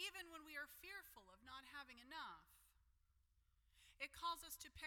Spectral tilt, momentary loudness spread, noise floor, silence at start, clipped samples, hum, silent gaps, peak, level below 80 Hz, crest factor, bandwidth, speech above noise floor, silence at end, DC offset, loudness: -1 dB/octave; 11 LU; -80 dBFS; 0 s; under 0.1%; none; none; -36 dBFS; -76 dBFS; 20 dB; 19 kHz; 25 dB; 0 s; under 0.1%; -53 LUFS